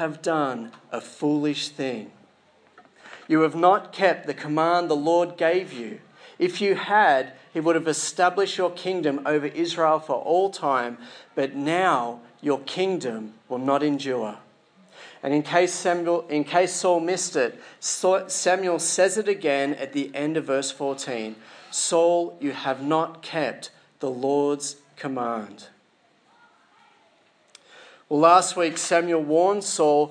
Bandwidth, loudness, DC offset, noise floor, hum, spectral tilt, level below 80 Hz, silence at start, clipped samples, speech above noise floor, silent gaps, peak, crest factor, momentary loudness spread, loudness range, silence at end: 10.5 kHz; -23 LUFS; under 0.1%; -62 dBFS; none; -3.5 dB/octave; -86 dBFS; 0 s; under 0.1%; 39 dB; none; -2 dBFS; 22 dB; 13 LU; 6 LU; 0 s